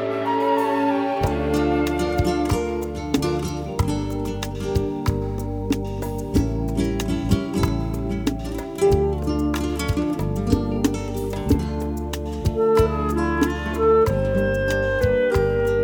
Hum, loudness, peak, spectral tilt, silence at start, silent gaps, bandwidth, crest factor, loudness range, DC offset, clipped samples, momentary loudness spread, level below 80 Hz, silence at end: none; -22 LUFS; -6 dBFS; -6.5 dB/octave; 0 s; none; over 20 kHz; 16 dB; 4 LU; under 0.1%; under 0.1%; 8 LU; -30 dBFS; 0 s